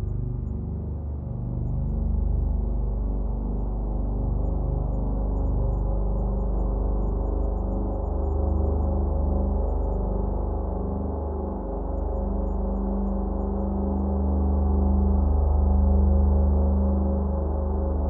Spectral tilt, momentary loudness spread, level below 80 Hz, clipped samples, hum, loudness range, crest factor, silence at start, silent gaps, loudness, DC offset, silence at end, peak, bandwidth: -14.5 dB/octave; 8 LU; -26 dBFS; under 0.1%; 50 Hz at -35 dBFS; 6 LU; 12 dB; 0 s; none; -27 LUFS; under 0.1%; 0 s; -12 dBFS; 1.7 kHz